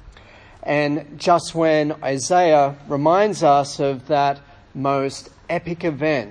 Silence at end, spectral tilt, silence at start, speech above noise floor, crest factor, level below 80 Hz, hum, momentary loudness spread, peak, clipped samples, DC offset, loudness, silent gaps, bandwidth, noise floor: 0 s; -5 dB/octave; 0.05 s; 26 dB; 18 dB; -52 dBFS; none; 11 LU; -2 dBFS; under 0.1%; under 0.1%; -19 LUFS; none; 10.5 kHz; -45 dBFS